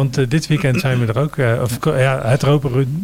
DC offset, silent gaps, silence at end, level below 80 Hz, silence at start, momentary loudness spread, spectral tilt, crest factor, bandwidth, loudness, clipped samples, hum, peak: under 0.1%; none; 0 s; -42 dBFS; 0 s; 3 LU; -6.5 dB/octave; 14 dB; 16 kHz; -17 LUFS; under 0.1%; none; -2 dBFS